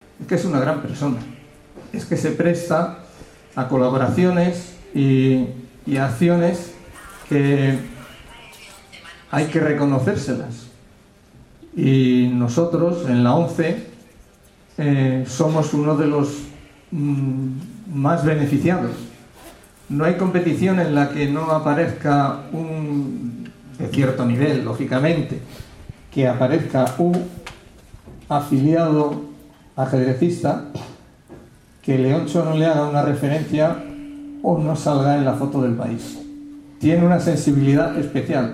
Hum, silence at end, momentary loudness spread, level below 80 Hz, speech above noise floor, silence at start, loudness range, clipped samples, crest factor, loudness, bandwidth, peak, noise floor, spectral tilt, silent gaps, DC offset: none; 0 s; 19 LU; -52 dBFS; 32 dB; 0.2 s; 3 LU; under 0.1%; 16 dB; -20 LUFS; 13.5 kHz; -4 dBFS; -50 dBFS; -7.5 dB/octave; none; under 0.1%